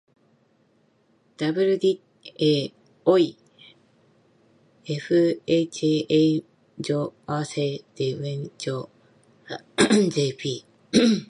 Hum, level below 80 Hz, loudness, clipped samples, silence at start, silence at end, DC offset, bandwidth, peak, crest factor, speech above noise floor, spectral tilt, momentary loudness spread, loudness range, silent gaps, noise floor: none; -64 dBFS; -24 LUFS; under 0.1%; 1.4 s; 0.05 s; under 0.1%; 11.5 kHz; -4 dBFS; 20 dB; 41 dB; -5.5 dB/octave; 14 LU; 3 LU; none; -63 dBFS